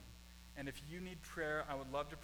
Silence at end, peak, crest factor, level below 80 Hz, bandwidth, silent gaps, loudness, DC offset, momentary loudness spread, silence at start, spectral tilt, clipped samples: 0 s; -28 dBFS; 18 dB; -60 dBFS; 19.5 kHz; none; -45 LUFS; under 0.1%; 15 LU; 0 s; -5 dB/octave; under 0.1%